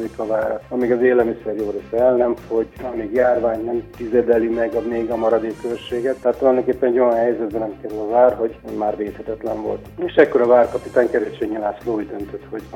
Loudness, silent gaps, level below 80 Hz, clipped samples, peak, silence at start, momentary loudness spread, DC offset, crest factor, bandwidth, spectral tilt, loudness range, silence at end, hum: -19 LUFS; none; -48 dBFS; under 0.1%; 0 dBFS; 0 s; 11 LU; under 0.1%; 18 dB; 15.5 kHz; -7 dB/octave; 1 LU; 0 s; none